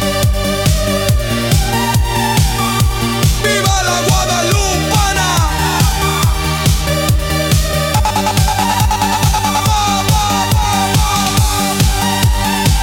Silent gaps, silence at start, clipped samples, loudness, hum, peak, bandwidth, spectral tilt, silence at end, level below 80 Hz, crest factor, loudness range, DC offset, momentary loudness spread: none; 0 s; under 0.1%; -13 LUFS; none; 0 dBFS; 18 kHz; -4 dB/octave; 0 s; -20 dBFS; 12 dB; 1 LU; under 0.1%; 2 LU